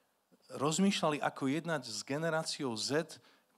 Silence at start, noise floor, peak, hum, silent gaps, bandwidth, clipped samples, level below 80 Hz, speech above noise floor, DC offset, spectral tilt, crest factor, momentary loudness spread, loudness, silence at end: 0.5 s; -69 dBFS; -20 dBFS; none; none; 14 kHz; under 0.1%; -84 dBFS; 35 dB; under 0.1%; -4 dB/octave; 16 dB; 9 LU; -34 LUFS; 0.4 s